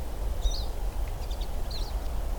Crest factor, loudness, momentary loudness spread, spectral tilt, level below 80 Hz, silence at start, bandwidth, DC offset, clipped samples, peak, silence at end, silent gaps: 14 dB; -35 LUFS; 3 LU; -4.5 dB/octave; -30 dBFS; 0 s; 19.5 kHz; under 0.1%; under 0.1%; -14 dBFS; 0 s; none